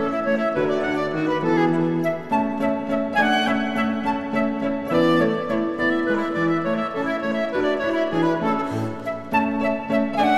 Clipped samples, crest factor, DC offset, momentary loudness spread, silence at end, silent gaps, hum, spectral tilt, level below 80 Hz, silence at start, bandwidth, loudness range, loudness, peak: under 0.1%; 16 dB; under 0.1%; 5 LU; 0 s; none; none; -6.5 dB/octave; -52 dBFS; 0 s; 12.5 kHz; 2 LU; -22 LUFS; -6 dBFS